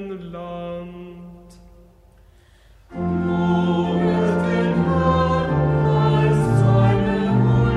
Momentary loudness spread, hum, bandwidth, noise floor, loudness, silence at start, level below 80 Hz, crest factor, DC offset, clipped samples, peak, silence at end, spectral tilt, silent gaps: 16 LU; none; 10 kHz; -51 dBFS; -19 LUFS; 0 s; -38 dBFS; 14 dB; under 0.1%; under 0.1%; -6 dBFS; 0 s; -8.5 dB/octave; none